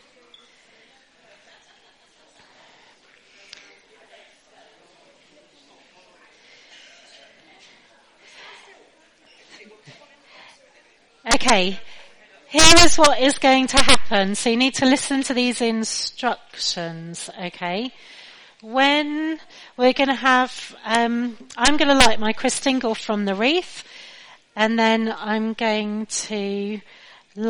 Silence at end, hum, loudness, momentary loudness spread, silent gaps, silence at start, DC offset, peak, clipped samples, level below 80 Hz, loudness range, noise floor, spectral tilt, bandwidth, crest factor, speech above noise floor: 0 s; none; -19 LUFS; 18 LU; none; 0 s; under 0.1%; 0 dBFS; under 0.1%; -42 dBFS; 10 LU; -56 dBFS; -2.5 dB/octave; 11 kHz; 22 dB; 38 dB